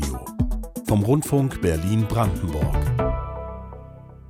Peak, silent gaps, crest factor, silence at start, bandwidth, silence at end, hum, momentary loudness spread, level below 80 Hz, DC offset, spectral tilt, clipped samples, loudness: -8 dBFS; none; 14 dB; 0 s; 16.5 kHz; 0 s; none; 16 LU; -32 dBFS; under 0.1%; -7 dB/octave; under 0.1%; -23 LUFS